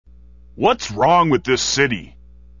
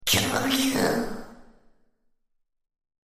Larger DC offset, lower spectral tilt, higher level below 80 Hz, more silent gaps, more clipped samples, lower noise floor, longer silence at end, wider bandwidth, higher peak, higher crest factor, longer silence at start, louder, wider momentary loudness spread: first, 0.4% vs under 0.1%; about the same, -4 dB/octave vs -3 dB/octave; first, -44 dBFS vs -50 dBFS; neither; neither; second, -45 dBFS vs -69 dBFS; second, 0.5 s vs 1.6 s; second, 7.4 kHz vs 15.5 kHz; first, -2 dBFS vs -8 dBFS; about the same, 18 dB vs 22 dB; first, 0.55 s vs 0 s; first, -17 LUFS vs -24 LUFS; second, 5 LU vs 13 LU